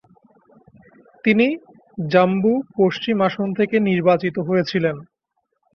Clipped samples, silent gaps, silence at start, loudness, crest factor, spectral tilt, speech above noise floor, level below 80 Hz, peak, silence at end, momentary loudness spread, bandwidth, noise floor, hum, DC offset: under 0.1%; none; 1.25 s; -19 LUFS; 18 dB; -8 dB/octave; 55 dB; -62 dBFS; -2 dBFS; 0.75 s; 7 LU; 6.6 kHz; -73 dBFS; none; under 0.1%